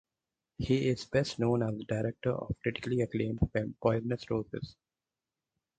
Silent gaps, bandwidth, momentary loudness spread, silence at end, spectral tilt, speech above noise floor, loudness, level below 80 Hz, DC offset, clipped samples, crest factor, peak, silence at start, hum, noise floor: none; 9.2 kHz; 6 LU; 1.05 s; -7 dB/octave; over 58 dB; -33 LUFS; -52 dBFS; under 0.1%; under 0.1%; 22 dB; -12 dBFS; 0.6 s; none; under -90 dBFS